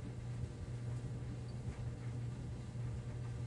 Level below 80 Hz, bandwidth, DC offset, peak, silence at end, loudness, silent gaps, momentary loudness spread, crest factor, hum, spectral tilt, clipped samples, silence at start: -54 dBFS; 11 kHz; under 0.1%; -32 dBFS; 0 s; -45 LUFS; none; 2 LU; 12 dB; none; -7.5 dB/octave; under 0.1%; 0 s